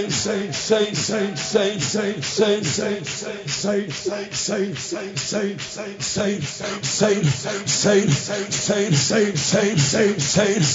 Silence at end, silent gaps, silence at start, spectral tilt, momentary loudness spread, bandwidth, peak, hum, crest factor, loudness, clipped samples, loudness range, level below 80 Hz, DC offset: 0 s; none; 0 s; -3.5 dB/octave; 9 LU; 7.8 kHz; -4 dBFS; none; 18 dB; -21 LUFS; under 0.1%; 6 LU; -56 dBFS; under 0.1%